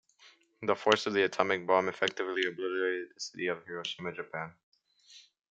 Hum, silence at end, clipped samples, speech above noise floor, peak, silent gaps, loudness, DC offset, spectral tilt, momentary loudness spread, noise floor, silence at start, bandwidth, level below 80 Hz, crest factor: none; 0.35 s; under 0.1%; 30 dB; -8 dBFS; 4.63-4.72 s; -32 LUFS; under 0.1%; -3.5 dB/octave; 12 LU; -62 dBFS; 0.25 s; 8.6 kHz; -78 dBFS; 26 dB